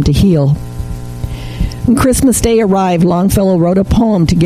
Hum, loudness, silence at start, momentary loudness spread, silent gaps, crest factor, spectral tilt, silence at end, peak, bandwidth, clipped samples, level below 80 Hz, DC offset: none; -11 LUFS; 0 s; 13 LU; none; 10 dB; -6.5 dB/octave; 0 s; 0 dBFS; 15.5 kHz; under 0.1%; -24 dBFS; under 0.1%